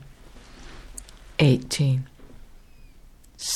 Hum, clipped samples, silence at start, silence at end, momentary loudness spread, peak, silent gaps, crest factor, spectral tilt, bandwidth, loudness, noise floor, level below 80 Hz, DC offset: none; under 0.1%; 0 s; 0 s; 25 LU; -6 dBFS; none; 20 dB; -5 dB/octave; 13.5 kHz; -23 LUFS; -49 dBFS; -46 dBFS; under 0.1%